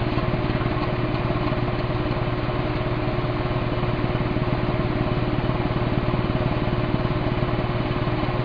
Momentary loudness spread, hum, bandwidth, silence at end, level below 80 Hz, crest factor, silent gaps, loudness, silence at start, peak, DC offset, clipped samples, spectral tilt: 1 LU; none; 5.2 kHz; 0 s; -32 dBFS; 14 dB; none; -24 LUFS; 0 s; -8 dBFS; under 0.1%; under 0.1%; -9.5 dB/octave